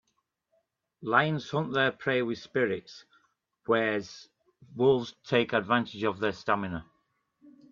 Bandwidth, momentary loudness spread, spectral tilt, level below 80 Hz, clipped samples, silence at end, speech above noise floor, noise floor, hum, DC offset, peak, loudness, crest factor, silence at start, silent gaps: 7.4 kHz; 16 LU; -6 dB/octave; -68 dBFS; under 0.1%; 0.2 s; 50 dB; -78 dBFS; none; under 0.1%; -8 dBFS; -28 LUFS; 22 dB; 1 s; none